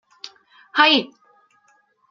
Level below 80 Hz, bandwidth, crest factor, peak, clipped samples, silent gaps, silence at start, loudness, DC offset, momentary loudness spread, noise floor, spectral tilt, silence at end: -84 dBFS; 7.4 kHz; 22 dB; -2 dBFS; under 0.1%; none; 0.25 s; -17 LUFS; under 0.1%; 25 LU; -61 dBFS; -3 dB/octave; 1.05 s